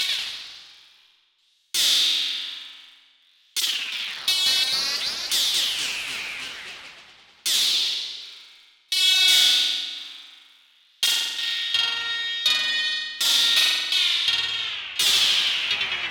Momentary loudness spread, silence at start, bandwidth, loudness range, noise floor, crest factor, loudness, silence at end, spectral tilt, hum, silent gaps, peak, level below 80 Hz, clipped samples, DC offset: 16 LU; 0 s; 18 kHz; 5 LU; -65 dBFS; 18 dB; -20 LUFS; 0 s; 3 dB/octave; none; none; -6 dBFS; -68 dBFS; under 0.1%; under 0.1%